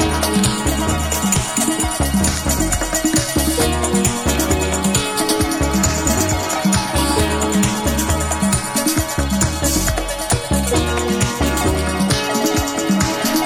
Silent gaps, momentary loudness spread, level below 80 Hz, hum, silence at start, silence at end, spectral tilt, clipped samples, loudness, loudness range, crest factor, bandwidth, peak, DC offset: none; 2 LU; -26 dBFS; none; 0 s; 0 s; -4 dB/octave; under 0.1%; -17 LUFS; 1 LU; 16 dB; 17 kHz; -2 dBFS; under 0.1%